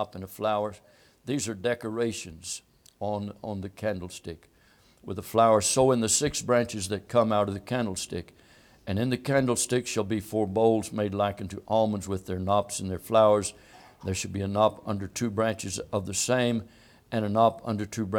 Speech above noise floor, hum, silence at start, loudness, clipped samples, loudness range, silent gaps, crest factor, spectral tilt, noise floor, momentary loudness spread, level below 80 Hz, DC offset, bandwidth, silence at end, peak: 33 dB; none; 0 s; -27 LUFS; under 0.1%; 8 LU; none; 20 dB; -4.5 dB/octave; -60 dBFS; 14 LU; -58 dBFS; under 0.1%; 18.5 kHz; 0 s; -8 dBFS